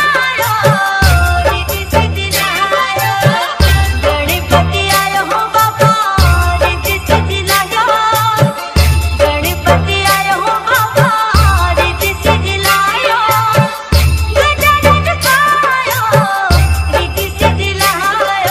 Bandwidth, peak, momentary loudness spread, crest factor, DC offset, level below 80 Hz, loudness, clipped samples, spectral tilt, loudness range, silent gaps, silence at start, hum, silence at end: 16.5 kHz; 0 dBFS; 3 LU; 12 dB; under 0.1%; -20 dBFS; -11 LUFS; under 0.1%; -4 dB/octave; 1 LU; none; 0 s; none; 0 s